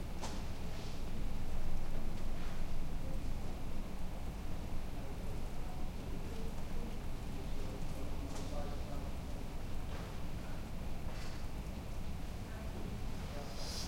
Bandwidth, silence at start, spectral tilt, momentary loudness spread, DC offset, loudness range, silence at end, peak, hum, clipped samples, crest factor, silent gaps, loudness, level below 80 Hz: 15.5 kHz; 0 s; -5.5 dB/octave; 2 LU; under 0.1%; 1 LU; 0 s; -22 dBFS; none; under 0.1%; 14 dB; none; -45 LUFS; -40 dBFS